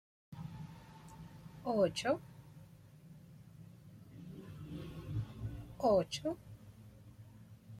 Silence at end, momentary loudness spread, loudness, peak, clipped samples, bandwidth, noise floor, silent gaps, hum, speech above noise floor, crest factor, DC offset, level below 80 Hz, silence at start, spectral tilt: 0 s; 24 LU; -38 LUFS; -20 dBFS; under 0.1%; 16 kHz; -58 dBFS; none; none; 24 dB; 22 dB; under 0.1%; -62 dBFS; 0.3 s; -6 dB/octave